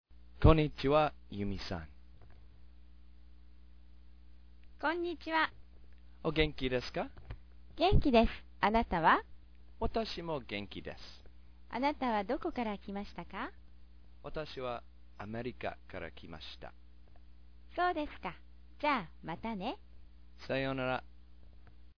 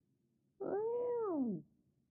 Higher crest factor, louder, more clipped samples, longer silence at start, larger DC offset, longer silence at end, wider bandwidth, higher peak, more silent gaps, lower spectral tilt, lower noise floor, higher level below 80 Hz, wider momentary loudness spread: first, 26 dB vs 12 dB; first, -35 LUFS vs -40 LUFS; neither; second, 0 s vs 0.6 s; first, 0.2% vs under 0.1%; second, 0 s vs 0.45 s; first, 5.4 kHz vs 2.8 kHz; first, -10 dBFS vs -28 dBFS; neither; second, -4.5 dB/octave vs -6 dB/octave; second, -58 dBFS vs -79 dBFS; first, -44 dBFS vs -82 dBFS; first, 19 LU vs 9 LU